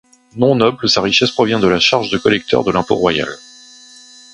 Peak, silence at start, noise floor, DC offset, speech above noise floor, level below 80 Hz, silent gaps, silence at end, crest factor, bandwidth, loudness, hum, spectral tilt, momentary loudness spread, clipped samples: 0 dBFS; 0.35 s; -41 dBFS; under 0.1%; 27 dB; -46 dBFS; none; 1 s; 16 dB; 11 kHz; -14 LUFS; none; -4.5 dB/octave; 7 LU; under 0.1%